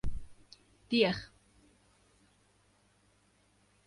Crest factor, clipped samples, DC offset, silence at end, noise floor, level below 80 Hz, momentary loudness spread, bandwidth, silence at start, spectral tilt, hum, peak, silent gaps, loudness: 24 dB; under 0.1%; under 0.1%; 2.6 s; -69 dBFS; -52 dBFS; 29 LU; 11.5 kHz; 0.05 s; -6 dB/octave; 50 Hz at -65 dBFS; -14 dBFS; none; -32 LUFS